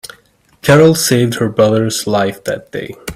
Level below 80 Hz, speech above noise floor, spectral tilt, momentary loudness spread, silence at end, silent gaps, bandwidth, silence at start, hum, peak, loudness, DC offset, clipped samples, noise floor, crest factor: -48 dBFS; 38 dB; -5 dB/octave; 15 LU; 0 s; none; 16.5 kHz; 0.65 s; none; 0 dBFS; -13 LUFS; under 0.1%; under 0.1%; -50 dBFS; 14 dB